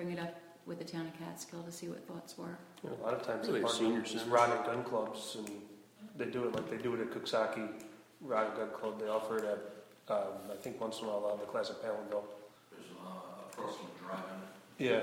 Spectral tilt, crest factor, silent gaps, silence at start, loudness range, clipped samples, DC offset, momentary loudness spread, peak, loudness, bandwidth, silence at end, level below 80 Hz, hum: -4.5 dB/octave; 24 dB; none; 0 s; 8 LU; under 0.1%; under 0.1%; 17 LU; -14 dBFS; -38 LUFS; 17.5 kHz; 0 s; -80 dBFS; none